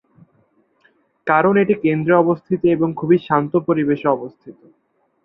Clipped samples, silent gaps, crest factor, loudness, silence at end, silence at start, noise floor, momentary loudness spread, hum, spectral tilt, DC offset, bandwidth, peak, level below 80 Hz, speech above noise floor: under 0.1%; none; 16 dB; -17 LUFS; 0.7 s; 1.25 s; -65 dBFS; 5 LU; none; -11 dB/octave; under 0.1%; 4.1 kHz; -2 dBFS; -60 dBFS; 48 dB